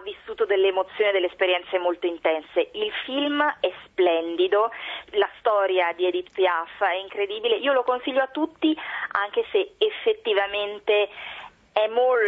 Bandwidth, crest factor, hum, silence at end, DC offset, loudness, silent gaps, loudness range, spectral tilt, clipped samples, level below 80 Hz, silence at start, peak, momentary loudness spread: 4.7 kHz; 18 dB; none; 0 s; under 0.1%; -24 LUFS; none; 1 LU; -5 dB/octave; under 0.1%; -66 dBFS; 0 s; -6 dBFS; 7 LU